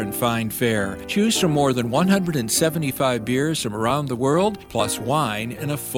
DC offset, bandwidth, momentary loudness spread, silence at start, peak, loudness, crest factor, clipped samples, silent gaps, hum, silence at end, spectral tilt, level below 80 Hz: under 0.1%; 19 kHz; 6 LU; 0 s; -6 dBFS; -21 LUFS; 16 dB; under 0.1%; none; none; 0 s; -4.5 dB/octave; -50 dBFS